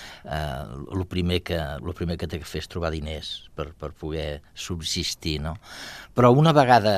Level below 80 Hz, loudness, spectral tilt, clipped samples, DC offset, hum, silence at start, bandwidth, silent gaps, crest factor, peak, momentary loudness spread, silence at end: -44 dBFS; -25 LUFS; -5.5 dB/octave; under 0.1%; under 0.1%; none; 0 s; 14.5 kHz; none; 22 dB; -2 dBFS; 18 LU; 0 s